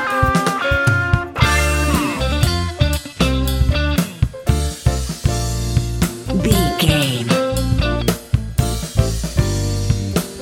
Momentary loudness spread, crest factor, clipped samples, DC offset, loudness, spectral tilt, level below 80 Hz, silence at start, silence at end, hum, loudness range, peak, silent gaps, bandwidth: 5 LU; 18 dB; under 0.1%; under 0.1%; -18 LUFS; -5 dB/octave; -24 dBFS; 0 s; 0 s; none; 2 LU; 0 dBFS; none; 17 kHz